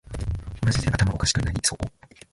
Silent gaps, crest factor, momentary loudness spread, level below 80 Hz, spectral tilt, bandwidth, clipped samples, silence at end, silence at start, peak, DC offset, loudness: none; 18 dB; 10 LU; -34 dBFS; -4 dB/octave; 11.5 kHz; under 0.1%; 0.45 s; 0.1 s; -8 dBFS; under 0.1%; -25 LUFS